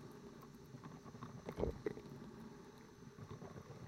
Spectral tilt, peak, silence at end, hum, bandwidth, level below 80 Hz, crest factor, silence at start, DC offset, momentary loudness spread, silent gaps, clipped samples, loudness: -7 dB/octave; -24 dBFS; 0 s; none; 16 kHz; -62 dBFS; 26 dB; 0 s; under 0.1%; 14 LU; none; under 0.1%; -51 LUFS